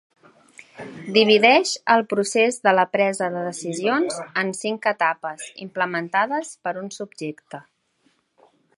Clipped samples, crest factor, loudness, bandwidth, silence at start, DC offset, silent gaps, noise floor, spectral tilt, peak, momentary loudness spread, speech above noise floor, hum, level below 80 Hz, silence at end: under 0.1%; 22 dB; -21 LUFS; 11.5 kHz; 0.8 s; under 0.1%; none; -66 dBFS; -3.5 dB/octave; 0 dBFS; 18 LU; 44 dB; none; -76 dBFS; 1.15 s